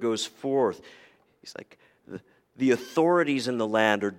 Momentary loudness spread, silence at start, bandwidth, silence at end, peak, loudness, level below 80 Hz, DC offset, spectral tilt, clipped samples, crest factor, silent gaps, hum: 21 LU; 0 s; 16 kHz; 0 s; -6 dBFS; -25 LUFS; -76 dBFS; under 0.1%; -4.5 dB/octave; under 0.1%; 22 dB; none; none